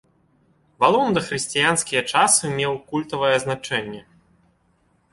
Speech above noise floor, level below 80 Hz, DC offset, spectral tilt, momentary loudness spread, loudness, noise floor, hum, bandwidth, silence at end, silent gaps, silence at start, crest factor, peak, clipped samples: 43 dB; -58 dBFS; under 0.1%; -2.5 dB/octave; 10 LU; -20 LUFS; -63 dBFS; none; 12 kHz; 1.1 s; none; 0.8 s; 20 dB; -2 dBFS; under 0.1%